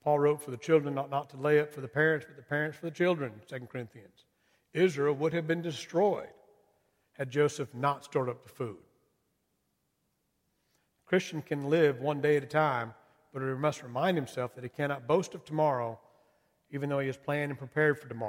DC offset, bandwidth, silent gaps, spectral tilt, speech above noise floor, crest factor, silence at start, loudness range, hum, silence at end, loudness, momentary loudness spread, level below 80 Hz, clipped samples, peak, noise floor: under 0.1%; 16 kHz; none; -6.5 dB/octave; 48 dB; 20 dB; 0.05 s; 5 LU; none; 0 s; -31 LUFS; 13 LU; -76 dBFS; under 0.1%; -12 dBFS; -78 dBFS